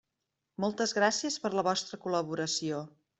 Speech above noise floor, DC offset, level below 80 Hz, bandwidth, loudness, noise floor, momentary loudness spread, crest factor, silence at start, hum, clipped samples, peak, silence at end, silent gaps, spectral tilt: 54 dB; under 0.1%; -74 dBFS; 8.2 kHz; -31 LUFS; -85 dBFS; 8 LU; 20 dB; 0.6 s; none; under 0.1%; -12 dBFS; 0.3 s; none; -3 dB/octave